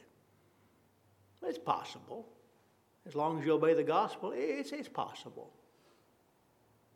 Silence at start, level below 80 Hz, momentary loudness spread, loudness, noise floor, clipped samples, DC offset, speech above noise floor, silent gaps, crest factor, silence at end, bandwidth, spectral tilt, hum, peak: 1.4 s; -88 dBFS; 20 LU; -35 LUFS; -70 dBFS; under 0.1%; under 0.1%; 35 dB; none; 20 dB; 1.45 s; 13 kHz; -6 dB/octave; none; -16 dBFS